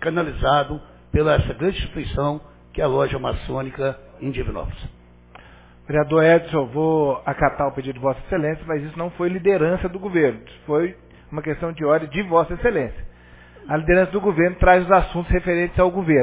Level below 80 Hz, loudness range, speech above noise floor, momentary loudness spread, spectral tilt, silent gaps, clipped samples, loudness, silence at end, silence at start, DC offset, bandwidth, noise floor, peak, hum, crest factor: -34 dBFS; 6 LU; 26 dB; 13 LU; -11 dB/octave; none; under 0.1%; -21 LUFS; 0 s; 0 s; under 0.1%; 4 kHz; -46 dBFS; 0 dBFS; 60 Hz at -50 dBFS; 20 dB